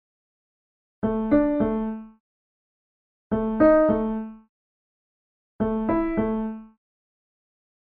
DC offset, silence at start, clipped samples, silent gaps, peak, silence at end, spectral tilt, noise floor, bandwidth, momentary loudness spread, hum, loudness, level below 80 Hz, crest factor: under 0.1%; 1.05 s; under 0.1%; 2.20-3.30 s, 4.49-5.59 s; -6 dBFS; 1.2 s; -11.5 dB/octave; under -90 dBFS; 4.4 kHz; 15 LU; none; -23 LUFS; -46 dBFS; 20 dB